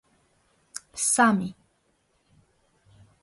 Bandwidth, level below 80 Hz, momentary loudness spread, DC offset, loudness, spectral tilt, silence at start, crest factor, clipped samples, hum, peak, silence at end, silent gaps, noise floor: 12 kHz; -68 dBFS; 21 LU; under 0.1%; -23 LUFS; -3.5 dB/octave; 0.75 s; 22 dB; under 0.1%; none; -8 dBFS; 1.7 s; none; -69 dBFS